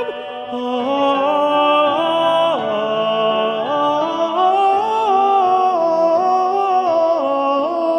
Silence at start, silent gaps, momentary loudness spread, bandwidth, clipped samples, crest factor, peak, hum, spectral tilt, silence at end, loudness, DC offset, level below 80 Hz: 0 s; none; 5 LU; 9.4 kHz; under 0.1%; 14 dB; -2 dBFS; none; -5 dB/octave; 0 s; -16 LUFS; under 0.1%; -68 dBFS